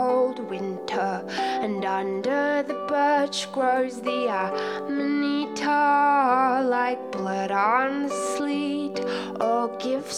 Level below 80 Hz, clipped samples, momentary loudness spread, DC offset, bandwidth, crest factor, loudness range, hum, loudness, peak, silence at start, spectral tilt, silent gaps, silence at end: -76 dBFS; under 0.1%; 8 LU; under 0.1%; 13 kHz; 16 dB; 3 LU; none; -24 LUFS; -8 dBFS; 0 s; -4 dB/octave; none; 0 s